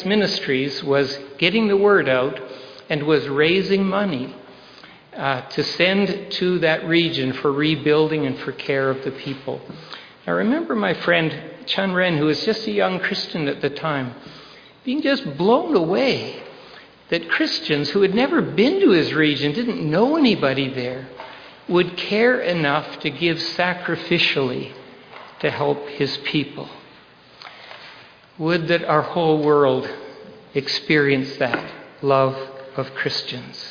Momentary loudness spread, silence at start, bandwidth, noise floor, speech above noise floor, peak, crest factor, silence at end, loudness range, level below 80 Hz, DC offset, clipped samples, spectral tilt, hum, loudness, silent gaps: 17 LU; 0 s; 5.4 kHz; -48 dBFS; 28 dB; -2 dBFS; 18 dB; 0 s; 4 LU; -60 dBFS; under 0.1%; under 0.1%; -6 dB/octave; none; -20 LUFS; none